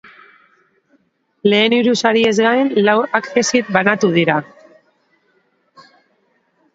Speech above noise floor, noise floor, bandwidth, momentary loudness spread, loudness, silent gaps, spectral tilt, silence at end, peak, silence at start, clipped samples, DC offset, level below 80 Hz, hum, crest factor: 48 dB; -62 dBFS; 8 kHz; 4 LU; -14 LUFS; none; -4.5 dB/octave; 2.3 s; 0 dBFS; 1.45 s; under 0.1%; under 0.1%; -64 dBFS; none; 18 dB